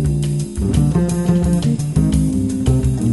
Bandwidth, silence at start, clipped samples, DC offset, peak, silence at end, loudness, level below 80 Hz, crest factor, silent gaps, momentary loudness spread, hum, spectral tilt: 12 kHz; 0 s; under 0.1%; 0.3%; -4 dBFS; 0 s; -17 LUFS; -26 dBFS; 12 dB; none; 3 LU; none; -7.5 dB/octave